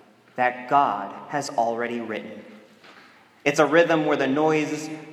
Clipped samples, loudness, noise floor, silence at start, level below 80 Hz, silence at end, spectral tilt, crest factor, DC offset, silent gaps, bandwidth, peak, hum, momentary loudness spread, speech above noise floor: under 0.1%; -23 LUFS; -52 dBFS; 0.35 s; -76 dBFS; 0 s; -5 dB/octave; 20 dB; under 0.1%; none; 15.5 kHz; -4 dBFS; none; 14 LU; 29 dB